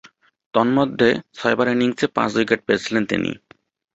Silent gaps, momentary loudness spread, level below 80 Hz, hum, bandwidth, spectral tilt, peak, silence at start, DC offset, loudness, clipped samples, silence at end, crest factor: none; 6 LU; -56 dBFS; none; 8 kHz; -5.5 dB/octave; -2 dBFS; 0.55 s; under 0.1%; -20 LUFS; under 0.1%; 0.55 s; 18 dB